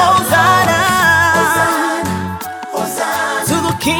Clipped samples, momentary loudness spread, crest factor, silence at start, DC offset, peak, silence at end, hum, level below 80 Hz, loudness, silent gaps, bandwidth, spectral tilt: under 0.1%; 11 LU; 12 dB; 0 s; under 0.1%; 0 dBFS; 0 s; none; -44 dBFS; -13 LUFS; none; 19 kHz; -3.5 dB/octave